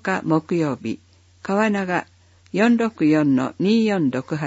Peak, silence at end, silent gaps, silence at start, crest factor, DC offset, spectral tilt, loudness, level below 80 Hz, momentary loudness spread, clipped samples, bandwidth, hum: -6 dBFS; 0 s; none; 0.05 s; 14 dB; under 0.1%; -7 dB/octave; -20 LUFS; -64 dBFS; 11 LU; under 0.1%; 8 kHz; none